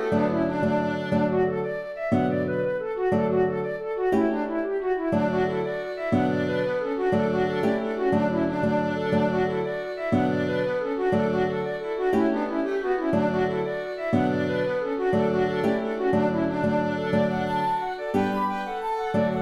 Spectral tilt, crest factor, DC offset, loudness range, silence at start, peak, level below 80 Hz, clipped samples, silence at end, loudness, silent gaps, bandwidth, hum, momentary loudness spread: -8 dB/octave; 14 dB; under 0.1%; 1 LU; 0 s; -10 dBFS; -54 dBFS; under 0.1%; 0 s; -25 LUFS; none; 12 kHz; none; 5 LU